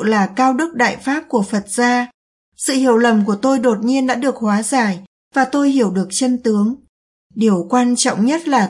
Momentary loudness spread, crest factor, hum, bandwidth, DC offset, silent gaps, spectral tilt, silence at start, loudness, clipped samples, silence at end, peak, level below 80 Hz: 6 LU; 14 dB; none; 11.5 kHz; under 0.1%; 2.14-2.52 s, 5.07-5.31 s, 6.89-7.30 s; -4.5 dB/octave; 0 s; -16 LUFS; under 0.1%; 0 s; -2 dBFS; -62 dBFS